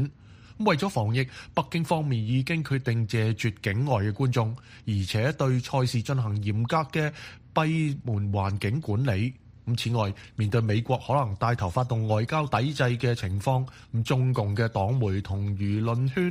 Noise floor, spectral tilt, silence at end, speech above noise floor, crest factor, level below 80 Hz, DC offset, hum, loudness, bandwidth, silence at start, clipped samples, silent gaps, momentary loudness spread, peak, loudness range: -49 dBFS; -7 dB/octave; 0 s; 23 dB; 18 dB; -54 dBFS; under 0.1%; none; -27 LUFS; 15 kHz; 0 s; under 0.1%; none; 5 LU; -8 dBFS; 1 LU